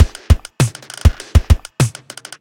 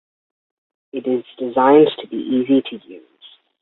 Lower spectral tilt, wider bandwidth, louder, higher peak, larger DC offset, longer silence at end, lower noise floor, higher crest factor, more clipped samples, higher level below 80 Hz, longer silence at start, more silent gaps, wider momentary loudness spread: second, -5.5 dB/octave vs -10.5 dB/octave; first, 16.5 kHz vs 4.2 kHz; about the same, -17 LUFS vs -17 LUFS; about the same, 0 dBFS vs -2 dBFS; neither; second, 0.5 s vs 0.65 s; second, -35 dBFS vs -49 dBFS; about the same, 14 dB vs 18 dB; first, 0.3% vs under 0.1%; first, -18 dBFS vs -66 dBFS; second, 0 s vs 0.95 s; neither; second, 5 LU vs 19 LU